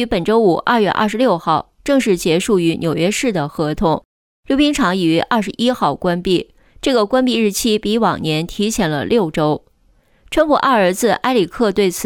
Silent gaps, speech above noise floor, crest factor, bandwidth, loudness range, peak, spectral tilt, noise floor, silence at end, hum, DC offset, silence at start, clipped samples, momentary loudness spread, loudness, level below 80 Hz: 4.05-4.43 s; 40 dB; 14 dB; 19.5 kHz; 1 LU; -2 dBFS; -5 dB/octave; -55 dBFS; 0 s; none; under 0.1%; 0 s; under 0.1%; 5 LU; -16 LUFS; -42 dBFS